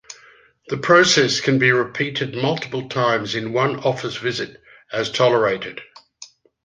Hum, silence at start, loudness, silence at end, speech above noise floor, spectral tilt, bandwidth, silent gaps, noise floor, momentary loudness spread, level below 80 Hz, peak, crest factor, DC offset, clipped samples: none; 0.1 s; -19 LUFS; 0.4 s; 32 dB; -4 dB/octave; 9.8 kHz; none; -51 dBFS; 13 LU; -60 dBFS; -2 dBFS; 18 dB; under 0.1%; under 0.1%